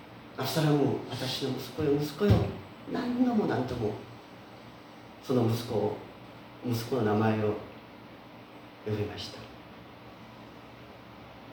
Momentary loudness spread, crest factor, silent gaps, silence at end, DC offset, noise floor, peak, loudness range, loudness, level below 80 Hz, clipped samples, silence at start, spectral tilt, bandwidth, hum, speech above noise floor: 22 LU; 22 dB; none; 0 s; under 0.1%; -49 dBFS; -10 dBFS; 12 LU; -30 LUFS; -54 dBFS; under 0.1%; 0 s; -6.5 dB/octave; over 20 kHz; none; 20 dB